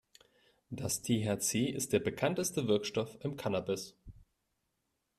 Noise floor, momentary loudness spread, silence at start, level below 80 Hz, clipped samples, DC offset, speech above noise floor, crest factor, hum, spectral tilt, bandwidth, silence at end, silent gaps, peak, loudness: -83 dBFS; 8 LU; 0.7 s; -66 dBFS; under 0.1%; under 0.1%; 49 dB; 20 dB; none; -4.5 dB/octave; 15 kHz; 1.05 s; none; -16 dBFS; -34 LUFS